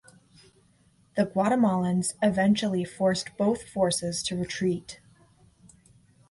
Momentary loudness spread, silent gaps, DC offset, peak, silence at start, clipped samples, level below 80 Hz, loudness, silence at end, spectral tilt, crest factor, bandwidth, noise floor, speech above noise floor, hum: 7 LU; none; under 0.1%; -12 dBFS; 1.15 s; under 0.1%; -60 dBFS; -26 LUFS; 1.35 s; -5 dB/octave; 16 dB; 11.5 kHz; -63 dBFS; 37 dB; none